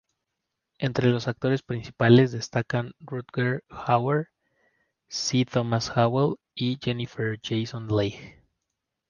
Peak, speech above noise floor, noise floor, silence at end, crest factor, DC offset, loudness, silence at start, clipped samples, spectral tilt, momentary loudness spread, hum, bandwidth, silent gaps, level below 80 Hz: -4 dBFS; 58 dB; -83 dBFS; 0.8 s; 22 dB; under 0.1%; -26 LUFS; 0.8 s; under 0.1%; -6 dB/octave; 11 LU; none; 7.2 kHz; none; -58 dBFS